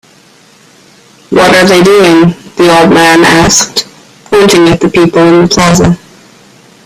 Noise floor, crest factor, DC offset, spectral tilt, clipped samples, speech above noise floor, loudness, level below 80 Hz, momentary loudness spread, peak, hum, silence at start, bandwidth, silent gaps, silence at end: -40 dBFS; 6 dB; under 0.1%; -4.5 dB/octave; 0.7%; 36 dB; -5 LUFS; -34 dBFS; 8 LU; 0 dBFS; none; 1.3 s; over 20 kHz; none; 0.9 s